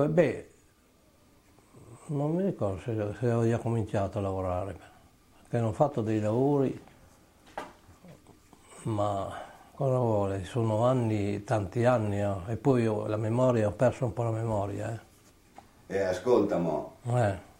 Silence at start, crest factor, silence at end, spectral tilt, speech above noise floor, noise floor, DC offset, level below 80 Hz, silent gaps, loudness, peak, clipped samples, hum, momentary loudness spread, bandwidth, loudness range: 0 s; 20 dB; 0.15 s; -8 dB/octave; 35 dB; -63 dBFS; under 0.1%; -58 dBFS; none; -29 LUFS; -10 dBFS; under 0.1%; none; 14 LU; 16 kHz; 5 LU